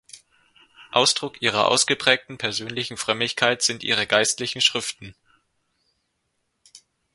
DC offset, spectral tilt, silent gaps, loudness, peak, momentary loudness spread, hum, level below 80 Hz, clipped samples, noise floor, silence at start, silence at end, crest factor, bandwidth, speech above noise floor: under 0.1%; -1.5 dB/octave; none; -21 LUFS; 0 dBFS; 8 LU; none; -64 dBFS; under 0.1%; -74 dBFS; 0.15 s; 0.35 s; 24 dB; 11.5 kHz; 52 dB